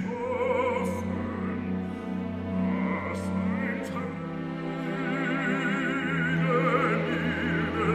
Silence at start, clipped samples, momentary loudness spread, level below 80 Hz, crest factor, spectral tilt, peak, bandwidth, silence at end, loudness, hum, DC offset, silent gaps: 0 s; under 0.1%; 8 LU; -54 dBFS; 18 dB; -7 dB/octave; -10 dBFS; 11.5 kHz; 0 s; -29 LUFS; none; under 0.1%; none